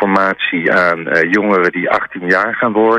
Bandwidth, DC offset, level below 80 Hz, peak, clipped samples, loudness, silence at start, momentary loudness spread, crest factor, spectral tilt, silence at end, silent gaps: 9.6 kHz; under 0.1%; -54 dBFS; -2 dBFS; under 0.1%; -13 LUFS; 0 s; 3 LU; 12 dB; -6.5 dB/octave; 0 s; none